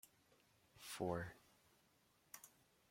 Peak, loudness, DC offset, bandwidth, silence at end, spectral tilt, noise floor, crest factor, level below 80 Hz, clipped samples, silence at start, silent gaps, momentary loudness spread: -28 dBFS; -49 LUFS; under 0.1%; 16.5 kHz; 0.4 s; -5 dB/octave; -77 dBFS; 24 dB; -78 dBFS; under 0.1%; 0.05 s; none; 21 LU